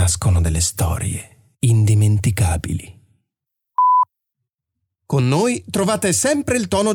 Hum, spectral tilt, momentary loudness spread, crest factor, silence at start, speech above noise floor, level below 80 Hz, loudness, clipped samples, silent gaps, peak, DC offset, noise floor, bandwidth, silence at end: none; -5 dB/octave; 9 LU; 12 dB; 0 s; 64 dB; -34 dBFS; -18 LUFS; under 0.1%; none; -6 dBFS; under 0.1%; -81 dBFS; 18.5 kHz; 0 s